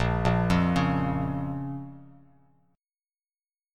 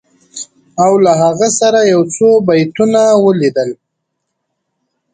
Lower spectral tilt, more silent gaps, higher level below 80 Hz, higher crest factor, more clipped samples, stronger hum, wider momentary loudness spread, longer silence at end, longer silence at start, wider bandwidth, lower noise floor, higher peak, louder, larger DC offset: first, -7.5 dB/octave vs -5 dB/octave; neither; first, -42 dBFS vs -56 dBFS; first, 18 dB vs 12 dB; neither; neither; second, 14 LU vs 18 LU; first, 1.7 s vs 1.4 s; second, 0 s vs 0.35 s; about the same, 10.5 kHz vs 9.6 kHz; first, under -90 dBFS vs -72 dBFS; second, -10 dBFS vs 0 dBFS; second, -27 LUFS vs -11 LUFS; neither